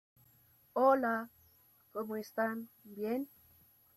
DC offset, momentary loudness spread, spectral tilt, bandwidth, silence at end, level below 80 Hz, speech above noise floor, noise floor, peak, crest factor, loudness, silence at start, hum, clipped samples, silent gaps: under 0.1%; 18 LU; -6 dB/octave; 15.5 kHz; 0.7 s; -82 dBFS; 33 dB; -67 dBFS; -16 dBFS; 20 dB; -35 LUFS; 0.75 s; none; under 0.1%; none